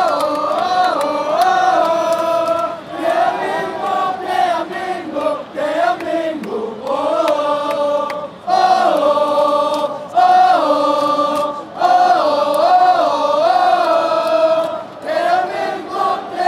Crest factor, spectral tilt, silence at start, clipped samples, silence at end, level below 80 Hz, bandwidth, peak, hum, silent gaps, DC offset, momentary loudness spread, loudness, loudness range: 14 dB; -4 dB/octave; 0 s; under 0.1%; 0 s; -64 dBFS; 14.5 kHz; -2 dBFS; none; none; under 0.1%; 9 LU; -16 LUFS; 5 LU